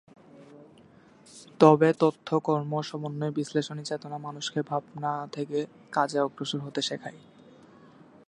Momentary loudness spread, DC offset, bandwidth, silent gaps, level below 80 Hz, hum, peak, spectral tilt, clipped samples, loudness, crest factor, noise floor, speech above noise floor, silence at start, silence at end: 14 LU; under 0.1%; 11 kHz; none; -76 dBFS; none; -4 dBFS; -6 dB/octave; under 0.1%; -28 LUFS; 26 dB; -55 dBFS; 28 dB; 0.4 s; 1.1 s